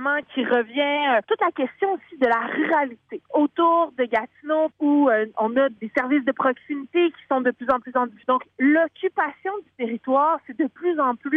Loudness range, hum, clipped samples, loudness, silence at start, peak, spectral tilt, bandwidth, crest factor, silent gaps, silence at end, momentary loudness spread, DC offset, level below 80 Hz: 2 LU; none; under 0.1%; -22 LUFS; 0 s; -8 dBFS; -6.5 dB/octave; 4.7 kHz; 14 dB; none; 0 s; 7 LU; under 0.1%; -68 dBFS